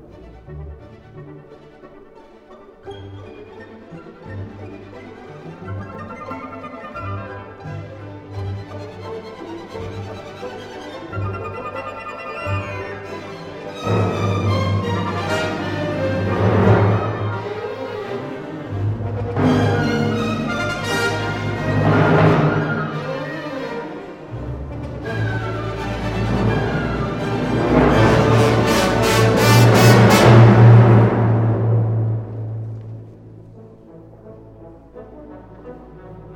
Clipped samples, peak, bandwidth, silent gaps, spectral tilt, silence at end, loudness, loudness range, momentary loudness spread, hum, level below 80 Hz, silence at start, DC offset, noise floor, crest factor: under 0.1%; 0 dBFS; 16 kHz; none; -6.5 dB/octave; 0 s; -17 LUFS; 23 LU; 24 LU; none; -38 dBFS; 0 s; under 0.1%; -44 dBFS; 18 dB